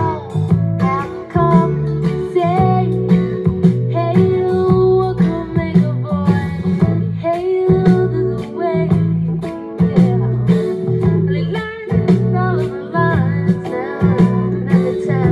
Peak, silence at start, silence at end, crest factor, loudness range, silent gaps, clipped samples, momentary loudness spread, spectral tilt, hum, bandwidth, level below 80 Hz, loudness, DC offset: -2 dBFS; 0 s; 0 s; 14 dB; 2 LU; none; under 0.1%; 6 LU; -9.5 dB/octave; none; 5.4 kHz; -40 dBFS; -16 LUFS; under 0.1%